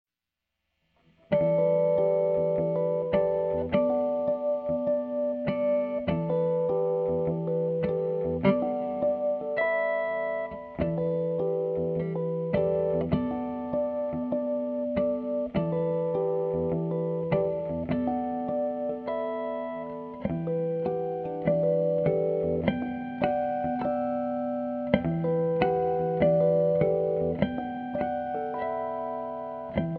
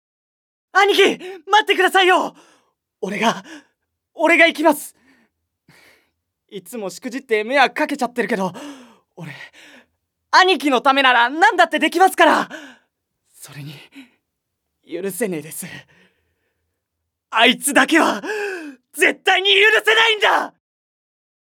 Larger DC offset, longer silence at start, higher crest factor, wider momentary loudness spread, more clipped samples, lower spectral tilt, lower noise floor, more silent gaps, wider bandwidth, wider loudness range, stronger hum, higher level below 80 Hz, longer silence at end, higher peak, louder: neither; first, 1.3 s vs 0.75 s; about the same, 22 dB vs 20 dB; second, 7 LU vs 22 LU; neither; first, -11 dB/octave vs -2.5 dB/octave; first, -87 dBFS vs -78 dBFS; neither; second, 4.6 kHz vs 19.5 kHz; second, 4 LU vs 15 LU; neither; first, -54 dBFS vs -76 dBFS; second, 0 s vs 1.05 s; second, -6 dBFS vs 0 dBFS; second, -28 LUFS vs -16 LUFS